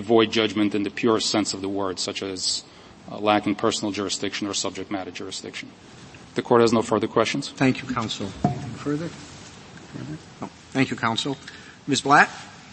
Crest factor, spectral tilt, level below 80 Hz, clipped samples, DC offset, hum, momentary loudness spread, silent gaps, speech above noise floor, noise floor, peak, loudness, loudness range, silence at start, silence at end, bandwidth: 24 dB; -4 dB/octave; -58 dBFS; under 0.1%; under 0.1%; none; 20 LU; none; 20 dB; -43 dBFS; 0 dBFS; -23 LUFS; 5 LU; 0 s; 0 s; 8.8 kHz